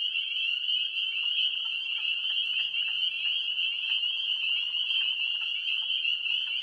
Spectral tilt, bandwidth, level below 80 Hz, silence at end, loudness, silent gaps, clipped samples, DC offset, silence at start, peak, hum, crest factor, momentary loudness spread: 2.5 dB/octave; 11 kHz; -82 dBFS; 0 s; -26 LUFS; none; under 0.1%; under 0.1%; 0 s; -18 dBFS; none; 12 dB; 2 LU